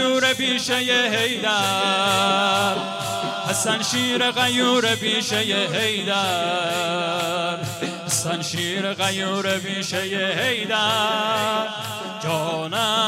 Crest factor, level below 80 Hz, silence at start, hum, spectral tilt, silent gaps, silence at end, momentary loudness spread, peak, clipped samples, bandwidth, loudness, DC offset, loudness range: 16 dB; -64 dBFS; 0 s; none; -2.5 dB/octave; none; 0 s; 7 LU; -6 dBFS; under 0.1%; 16 kHz; -21 LUFS; under 0.1%; 3 LU